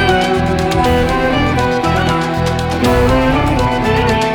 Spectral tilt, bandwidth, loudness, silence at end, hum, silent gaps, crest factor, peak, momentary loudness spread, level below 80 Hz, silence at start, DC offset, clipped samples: -6 dB/octave; 20 kHz; -14 LUFS; 0 s; none; none; 10 dB; -2 dBFS; 3 LU; -24 dBFS; 0 s; under 0.1%; under 0.1%